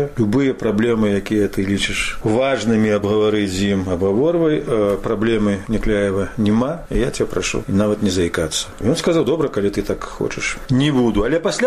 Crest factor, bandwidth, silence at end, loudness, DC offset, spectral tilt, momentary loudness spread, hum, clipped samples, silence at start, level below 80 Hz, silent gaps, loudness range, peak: 14 dB; 14 kHz; 0 s; -18 LUFS; 0.2%; -5.5 dB/octave; 5 LU; none; under 0.1%; 0 s; -34 dBFS; none; 2 LU; -4 dBFS